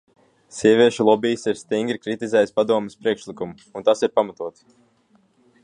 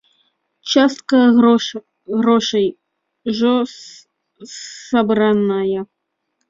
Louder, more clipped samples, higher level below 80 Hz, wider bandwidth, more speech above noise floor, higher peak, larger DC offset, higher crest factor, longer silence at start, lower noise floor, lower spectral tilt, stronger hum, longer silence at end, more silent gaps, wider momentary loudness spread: second, -20 LUFS vs -16 LUFS; neither; second, -66 dBFS vs -60 dBFS; first, 10.5 kHz vs 7.6 kHz; second, 40 dB vs 57 dB; about the same, -2 dBFS vs -2 dBFS; neither; about the same, 18 dB vs 16 dB; about the same, 0.55 s vs 0.65 s; second, -60 dBFS vs -72 dBFS; about the same, -5 dB/octave vs -5 dB/octave; neither; first, 1.15 s vs 0.65 s; neither; second, 16 LU vs 20 LU